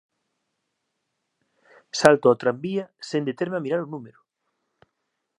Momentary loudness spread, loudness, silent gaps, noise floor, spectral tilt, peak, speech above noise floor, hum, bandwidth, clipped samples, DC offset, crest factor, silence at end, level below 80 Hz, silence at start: 15 LU; -23 LUFS; none; -78 dBFS; -5 dB/octave; 0 dBFS; 56 dB; none; 13 kHz; under 0.1%; under 0.1%; 26 dB; 1.3 s; -66 dBFS; 1.95 s